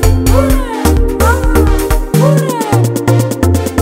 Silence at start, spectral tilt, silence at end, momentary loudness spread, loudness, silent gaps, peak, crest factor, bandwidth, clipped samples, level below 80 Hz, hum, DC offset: 0 s; -6 dB/octave; 0 s; 3 LU; -11 LUFS; none; 0 dBFS; 10 dB; 16.5 kHz; 0.2%; -14 dBFS; none; under 0.1%